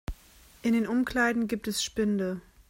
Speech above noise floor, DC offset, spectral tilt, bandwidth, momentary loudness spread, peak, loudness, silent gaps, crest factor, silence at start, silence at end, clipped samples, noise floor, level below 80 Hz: 28 dB; under 0.1%; -4.5 dB/octave; 16 kHz; 8 LU; -12 dBFS; -28 LUFS; none; 16 dB; 0.1 s; 0.3 s; under 0.1%; -56 dBFS; -48 dBFS